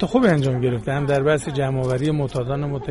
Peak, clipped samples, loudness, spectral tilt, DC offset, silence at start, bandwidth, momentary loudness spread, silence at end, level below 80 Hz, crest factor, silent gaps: -4 dBFS; under 0.1%; -21 LUFS; -7 dB/octave; under 0.1%; 0 s; 11.5 kHz; 7 LU; 0 s; -42 dBFS; 16 dB; none